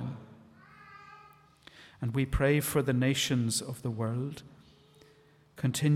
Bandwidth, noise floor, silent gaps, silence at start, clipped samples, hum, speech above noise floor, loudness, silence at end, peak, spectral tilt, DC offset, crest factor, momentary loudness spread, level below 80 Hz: 16.5 kHz; -61 dBFS; none; 0 s; under 0.1%; none; 32 dB; -30 LUFS; 0 s; -14 dBFS; -5 dB/octave; under 0.1%; 18 dB; 24 LU; -48 dBFS